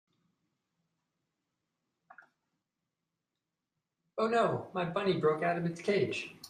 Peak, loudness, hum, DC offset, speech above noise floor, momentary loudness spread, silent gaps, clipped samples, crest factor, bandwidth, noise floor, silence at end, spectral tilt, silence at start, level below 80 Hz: -18 dBFS; -32 LUFS; none; under 0.1%; 57 dB; 6 LU; none; under 0.1%; 18 dB; 14 kHz; -89 dBFS; 0 s; -6 dB/octave; 4.15 s; -76 dBFS